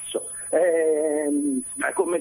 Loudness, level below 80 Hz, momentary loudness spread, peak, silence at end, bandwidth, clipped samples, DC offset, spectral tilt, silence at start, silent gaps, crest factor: -23 LUFS; -66 dBFS; 7 LU; -10 dBFS; 0 s; 15 kHz; under 0.1%; under 0.1%; -3 dB/octave; 0 s; none; 14 dB